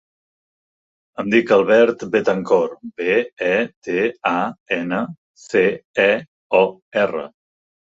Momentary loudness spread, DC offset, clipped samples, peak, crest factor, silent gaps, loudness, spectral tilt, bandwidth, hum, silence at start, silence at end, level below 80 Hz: 10 LU; under 0.1%; under 0.1%; -2 dBFS; 18 dB; 3.33-3.37 s, 3.76-3.82 s, 4.60-4.66 s, 5.18-5.35 s, 5.85-5.94 s, 6.28-6.50 s, 6.82-6.91 s; -19 LUFS; -6 dB/octave; 7.8 kHz; none; 1.2 s; 0.65 s; -64 dBFS